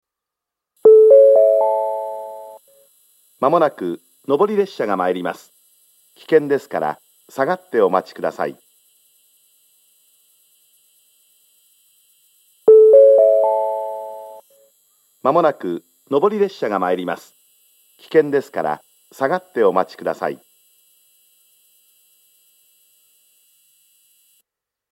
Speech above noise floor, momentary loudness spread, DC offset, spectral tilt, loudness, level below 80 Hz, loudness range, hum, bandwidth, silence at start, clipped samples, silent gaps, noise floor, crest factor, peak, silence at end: 65 dB; 20 LU; under 0.1%; -6.5 dB/octave; -16 LUFS; -80 dBFS; 10 LU; none; 13.5 kHz; 0.85 s; under 0.1%; none; -84 dBFS; 18 dB; 0 dBFS; 4.55 s